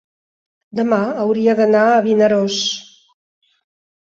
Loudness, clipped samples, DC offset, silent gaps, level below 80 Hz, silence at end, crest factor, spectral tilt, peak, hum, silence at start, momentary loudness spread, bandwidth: -15 LUFS; under 0.1%; under 0.1%; none; -64 dBFS; 1.3 s; 14 dB; -4.5 dB/octave; -2 dBFS; none; 0.75 s; 9 LU; 7.8 kHz